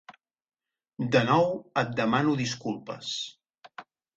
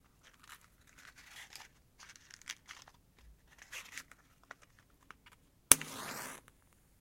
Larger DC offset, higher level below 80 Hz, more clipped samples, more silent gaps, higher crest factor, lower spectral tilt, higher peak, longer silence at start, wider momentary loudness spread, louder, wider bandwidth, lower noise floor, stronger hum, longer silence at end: neither; about the same, -66 dBFS vs -64 dBFS; neither; neither; second, 20 dB vs 42 dB; first, -5.5 dB/octave vs 0 dB/octave; second, -8 dBFS vs 0 dBFS; second, 0.1 s vs 0.5 s; second, 24 LU vs 31 LU; first, -27 LUFS vs -32 LUFS; second, 8.4 kHz vs 16.5 kHz; second, -50 dBFS vs -68 dBFS; neither; second, 0.35 s vs 0.65 s